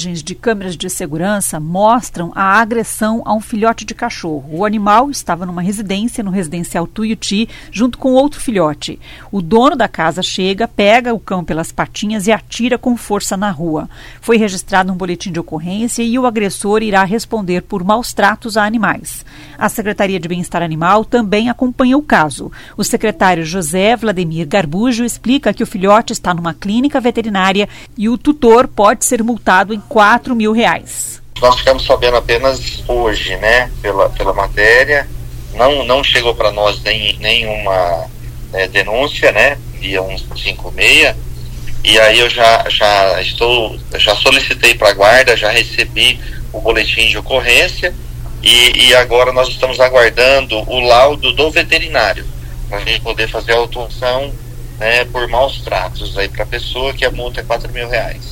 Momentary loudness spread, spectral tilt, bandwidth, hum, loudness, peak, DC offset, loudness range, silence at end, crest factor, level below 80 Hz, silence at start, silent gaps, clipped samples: 12 LU; -3.5 dB/octave; 17 kHz; none; -12 LUFS; 0 dBFS; under 0.1%; 7 LU; 0 s; 14 dB; -28 dBFS; 0 s; none; 0.2%